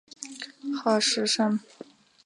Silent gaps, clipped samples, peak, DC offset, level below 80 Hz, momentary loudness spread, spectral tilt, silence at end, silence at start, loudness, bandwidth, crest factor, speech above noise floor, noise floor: none; under 0.1%; -10 dBFS; under 0.1%; -80 dBFS; 15 LU; -3 dB/octave; 0.4 s; 0.2 s; -25 LUFS; 11.5 kHz; 18 dB; 24 dB; -49 dBFS